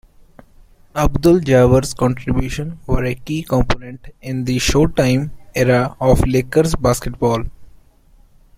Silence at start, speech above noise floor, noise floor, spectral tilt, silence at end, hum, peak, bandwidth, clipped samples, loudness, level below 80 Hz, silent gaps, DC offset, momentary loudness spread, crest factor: 0.95 s; 33 dB; -49 dBFS; -6 dB/octave; 0.9 s; none; -2 dBFS; 16 kHz; under 0.1%; -17 LUFS; -28 dBFS; none; under 0.1%; 12 LU; 16 dB